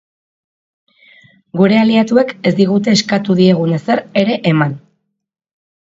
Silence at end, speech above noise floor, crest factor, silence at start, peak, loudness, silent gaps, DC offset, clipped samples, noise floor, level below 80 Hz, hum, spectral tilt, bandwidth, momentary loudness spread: 1.15 s; 52 dB; 14 dB; 1.55 s; 0 dBFS; -13 LUFS; none; under 0.1%; under 0.1%; -64 dBFS; -58 dBFS; none; -6 dB/octave; 7.8 kHz; 5 LU